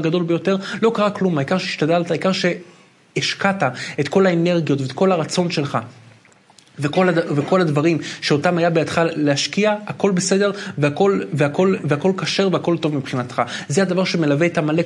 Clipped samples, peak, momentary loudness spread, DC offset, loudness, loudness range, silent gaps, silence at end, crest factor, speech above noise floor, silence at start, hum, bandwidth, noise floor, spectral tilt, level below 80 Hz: under 0.1%; -2 dBFS; 5 LU; under 0.1%; -19 LUFS; 2 LU; none; 0 s; 18 dB; 32 dB; 0 s; none; 11.5 kHz; -51 dBFS; -5.5 dB/octave; -66 dBFS